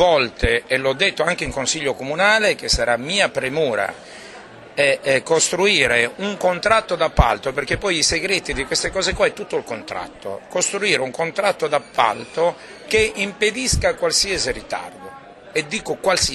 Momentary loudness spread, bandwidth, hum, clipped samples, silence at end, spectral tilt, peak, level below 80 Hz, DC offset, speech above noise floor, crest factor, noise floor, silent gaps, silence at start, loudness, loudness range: 12 LU; 13 kHz; none; under 0.1%; 0 s; -2.5 dB/octave; 0 dBFS; -34 dBFS; under 0.1%; 20 dB; 20 dB; -40 dBFS; none; 0 s; -19 LUFS; 4 LU